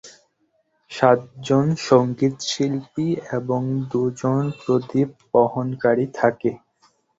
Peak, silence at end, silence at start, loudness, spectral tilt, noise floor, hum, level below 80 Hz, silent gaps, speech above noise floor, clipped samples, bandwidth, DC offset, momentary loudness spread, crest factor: -2 dBFS; 0.6 s; 0.05 s; -21 LUFS; -6.5 dB/octave; -67 dBFS; none; -60 dBFS; none; 47 dB; under 0.1%; 8 kHz; under 0.1%; 7 LU; 20 dB